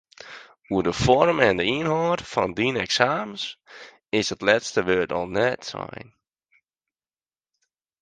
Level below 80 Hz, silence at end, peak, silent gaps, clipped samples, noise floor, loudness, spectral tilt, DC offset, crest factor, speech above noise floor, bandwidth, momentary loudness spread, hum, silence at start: -50 dBFS; 2 s; -2 dBFS; none; under 0.1%; under -90 dBFS; -23 LUFS; -4.5 dB/octave; under 0.1%; 24 dB; over 67 dB; 9.8 kHz; 20 LU; none; 0.2 s